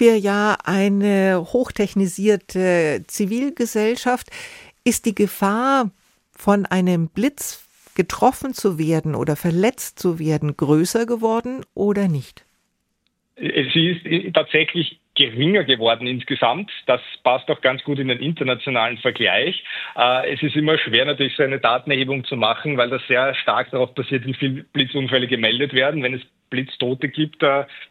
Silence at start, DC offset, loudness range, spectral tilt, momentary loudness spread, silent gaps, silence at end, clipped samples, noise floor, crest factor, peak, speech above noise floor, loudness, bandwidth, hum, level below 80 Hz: 0 s; under 0.1%; 3 LU; -5 dB/octave; 7 LU; none; 0.05 s; under 0.1%; -71 dBFS; 18 dB; -2 dBFS; 51 dB; -20 LUFS; 16.5 kHz; none; -56 dBFS